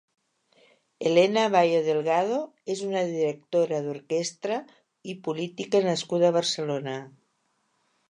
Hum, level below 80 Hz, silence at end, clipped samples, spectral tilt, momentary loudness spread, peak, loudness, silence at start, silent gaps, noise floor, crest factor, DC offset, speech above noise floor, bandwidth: none; -80 dBFS; 1 s; under 0.1%; -4.5 dB/octave; 12 LU; -8 dBFS; -26 LUFS; 1 s; none; -73 dBFS; 20 dB; under 0.1%; 47 dB; 11 kHz